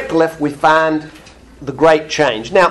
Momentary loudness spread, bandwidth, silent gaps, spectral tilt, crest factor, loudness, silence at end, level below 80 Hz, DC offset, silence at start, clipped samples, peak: 11 LU; 12.5 kHz; none; -4.5 dB/octave; 14 dB; -14 LUFS; 0 s; -46 dBFS; under 0.1%; 0 s; under 0.1%; 0 dBFS